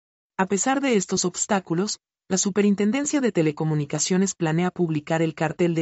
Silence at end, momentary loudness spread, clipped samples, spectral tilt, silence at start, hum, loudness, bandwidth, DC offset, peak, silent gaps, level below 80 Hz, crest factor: 0 s; 5 LU; under 0.1%; -4.5 dB/octave; 0.4 s; none; -23 LUFS; 8.2 kHz; under 0.1%; -8 dBFS; none; -64 dBFS; 16 dB